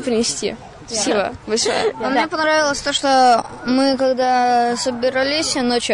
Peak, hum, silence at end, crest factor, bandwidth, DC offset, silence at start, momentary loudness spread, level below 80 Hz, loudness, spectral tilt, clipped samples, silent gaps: -6 dBFS; none; 0 s; 12 dB; 11 kHz; under 0.1%; 0 s; 6 LU; -50 dBFS; -17 LUFS; -2.5 dB/octave; under 0.1%; none